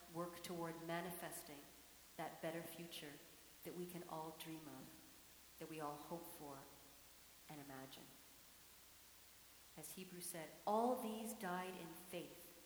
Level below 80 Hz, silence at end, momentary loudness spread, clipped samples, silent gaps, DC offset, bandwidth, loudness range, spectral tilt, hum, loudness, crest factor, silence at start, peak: -80 dBFS; 0 s; 15 LU; under 0.1%; none; under 0.1%; over 20 kHz; 11 LU; -4 dB/octave; none; -50 LUFS; 22 dB; 0 s; -28 dBFS